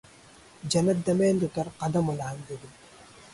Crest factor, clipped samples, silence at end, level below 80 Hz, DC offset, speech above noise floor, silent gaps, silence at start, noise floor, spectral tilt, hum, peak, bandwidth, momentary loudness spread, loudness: 16 dB; under 0.1%; 0.05 s; -58 dBFS; under 0.1%; 26 dB; none; 0.65 s; -53 dBFS; -6 dB/octave; none; -12 dBFS; 11.5 kHz; 17 LU; -27 LUFS